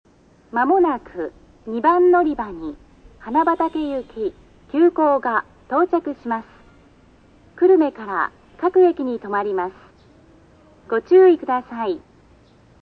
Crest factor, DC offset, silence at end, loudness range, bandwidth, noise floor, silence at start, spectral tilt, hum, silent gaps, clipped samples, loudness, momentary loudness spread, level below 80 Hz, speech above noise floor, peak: 16 dB; under 0.1%; 0.85 s; 2 LU; 4.7 kHz; -51 dBFS; 0.55 s; -7.5 dB/octave; none; none; under 0.1%; -19 LUFS; 15 LU; -54 dBFS; 33 dB; -4 dBFS